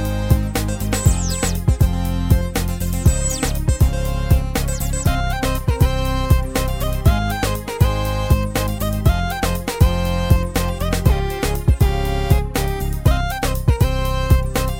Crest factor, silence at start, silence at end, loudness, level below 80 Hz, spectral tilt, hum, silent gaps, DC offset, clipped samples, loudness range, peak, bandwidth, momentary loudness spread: 18 dB; 0 s; 0 s; -19 LUFS; -20 dBFS; -5.5 dB/octave; none; none; under 0.1%; under 0.1%; 1 LU; 0 dBFS; 17 kHz; 4 LU